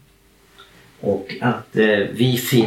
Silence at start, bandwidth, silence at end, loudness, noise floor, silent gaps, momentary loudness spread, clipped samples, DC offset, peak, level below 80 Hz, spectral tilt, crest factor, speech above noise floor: 0.6 s; 17 kHz; 0 s; -20 LUFS; -54 dBFS; none; 7 LU; under 0.1%; under 0.1%; -2 dBFS; -58 dBFS; -5.5 dB/octave; 18 dB; 35 dB